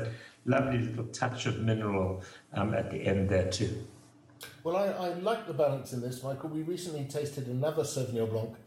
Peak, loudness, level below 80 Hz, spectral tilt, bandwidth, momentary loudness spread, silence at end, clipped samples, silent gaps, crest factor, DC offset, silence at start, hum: -14 dBFS; -32 LUFS; -62 dBFS; -6 dB/octave; 16 kHz; 10 LU; 0.05 s; under 0.1%; none; 18 dB; under 0.1%; 0 s; none